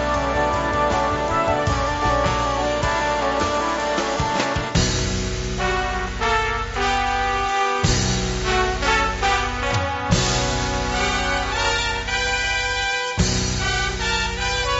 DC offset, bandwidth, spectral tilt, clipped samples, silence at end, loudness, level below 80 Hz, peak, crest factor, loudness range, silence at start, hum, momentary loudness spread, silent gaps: under 0.1%; 8 kHz; -3 dB/octave; under 0.1%; 0 s; -21 LUFS; -30 dBFS; -4 dBFS; 16 dB; 1 LU; 0 s; none; 3 LU; none